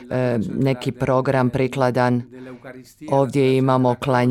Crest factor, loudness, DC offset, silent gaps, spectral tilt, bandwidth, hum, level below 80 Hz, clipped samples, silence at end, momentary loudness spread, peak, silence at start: 16 dB; -20 LUFS; under 0.1%; none; -7.5 dB/octave; 12.5 kHz; none; -52 dBFS; under 0.1%; 0 s; 20 LU; -4 dBFS; 0 s